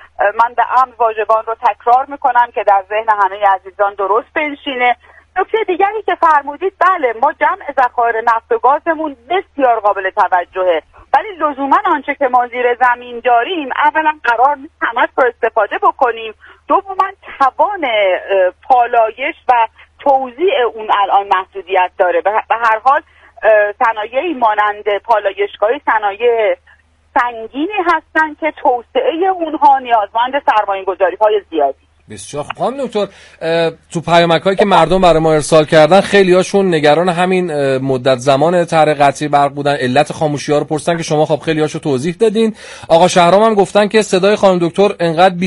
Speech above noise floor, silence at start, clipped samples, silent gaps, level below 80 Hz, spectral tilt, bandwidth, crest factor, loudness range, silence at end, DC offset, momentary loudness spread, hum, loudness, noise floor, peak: 22 dB; 0.2 s; under 0.1%; none; -46 dBFS; -5 dB/octave; 11.5 kHz; 14 dB; 4 LU; 0 s; under 0.1%; 8 LU; none; -13 LUFS; -35 dBFS; 0 dBFS